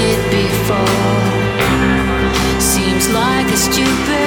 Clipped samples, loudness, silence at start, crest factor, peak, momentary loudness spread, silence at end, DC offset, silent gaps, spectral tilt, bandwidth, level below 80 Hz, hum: under 0.1%; -14 LUFS; 0 s; 12 dB; -2 dBFS; 2 LU; 0 s; under 0.1%; none; -4 dB/octave; 19.5 kHz; -28 dBFS; none